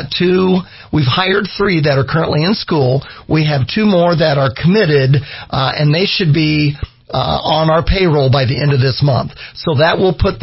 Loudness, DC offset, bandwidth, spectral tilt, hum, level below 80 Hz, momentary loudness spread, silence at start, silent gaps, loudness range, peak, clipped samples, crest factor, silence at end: -13 LUFS; under 0.1%; 5.8 kHz; -10 dB/octave; none; -32 dBFS; 6 LU; 0 s; none; 1 LU; 0 dBFS; under 0.1%; 12 dB; 0 s